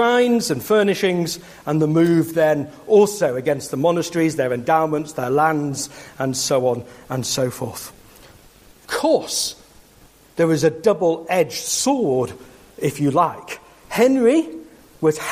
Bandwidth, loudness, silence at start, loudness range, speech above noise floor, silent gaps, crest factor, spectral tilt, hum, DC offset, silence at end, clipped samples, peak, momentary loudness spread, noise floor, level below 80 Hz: 15.5 kHz; -19 LUFS; 0 s; 6 LU; 31 dB; none; 16 dB; -4.5 dB/octave; none; under 0.1%; 0 s; under 0.1%; -4 dBFS; 12 LU; -50 dBFS; -58 dBFS